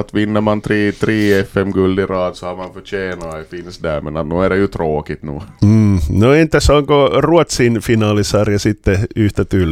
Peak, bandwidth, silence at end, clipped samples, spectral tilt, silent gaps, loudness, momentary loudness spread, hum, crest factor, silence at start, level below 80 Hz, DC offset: 0 dBFS; 15.5 kHz; 0 s; under 0.1%; -6.5 dB/octave; none; -14 LUFS; 14 LU; none; 14 dB; 0 s; -30 dBFS; under 0.1%